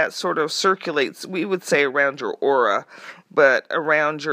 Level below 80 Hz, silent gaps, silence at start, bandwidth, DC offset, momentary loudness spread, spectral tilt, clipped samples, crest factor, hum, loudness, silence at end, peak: -78 dBFS; none; 0 s; 15.5 kHz; under 0.1%; 9 LU; -3.5 dB/octave; under 0.1%; 20 dB; none; -20 LUFS; 0 s; -2 dBFS